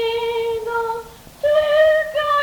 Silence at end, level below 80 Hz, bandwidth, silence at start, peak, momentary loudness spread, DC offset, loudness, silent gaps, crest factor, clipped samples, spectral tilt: 0 s; -50 dBFS; 19 kHz; 0 s; -4 dBFS; 10 LU; under 0.1%; -18 LUFS; none; 14 dB; under 0.1%; -2.5 dB/octave